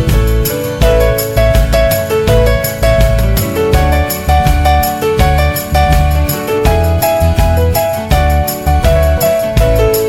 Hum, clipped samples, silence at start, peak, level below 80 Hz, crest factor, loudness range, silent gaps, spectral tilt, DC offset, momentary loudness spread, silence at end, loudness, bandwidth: none; under 0.1%; 0 s; 0 dBFS; -14 dBFS; 10 dB; 0 LU; none; -5.5 dB/octave; under 0.1%; 3 LU; 0 s; -11 LUFS; 18 kHz